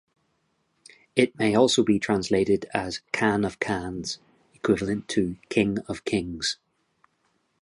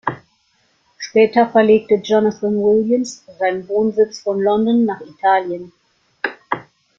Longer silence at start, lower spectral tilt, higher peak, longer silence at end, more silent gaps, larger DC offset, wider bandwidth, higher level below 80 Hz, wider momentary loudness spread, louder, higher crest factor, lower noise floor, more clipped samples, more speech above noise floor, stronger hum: first, 1.15 s vs 0.05 s; about the same, -4.5 dB/octave vs -5.5 dB/octave; about the same, -4 dBFS vs -2 dBFS; first, 1.1 s vs 0.35 s; neither; neither; first, 11.5 kHz vs 7.6 kHz; first, -54 dBFS vs -60 dBFS; second, 10 LU vs 13 LU; second, -25 LUFS vs -17 LUFS; first, 22 dB vs 16 dB; first, -72 dBFS vs -61 dBFS; neither; about the same, 47 dB vs 45 dB; neither